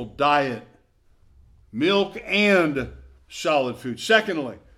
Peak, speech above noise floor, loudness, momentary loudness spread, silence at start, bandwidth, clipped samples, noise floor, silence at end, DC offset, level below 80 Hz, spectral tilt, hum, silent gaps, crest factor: -2 dBFS; 36 dB; -22 LUFS; 16 LU; 0 s; 15 kHz; under 0.1%; -58 dBFS; 0.2 s; under 0.1%; -52 dBFS; -4.5 dB/octave; none; none; 20 dB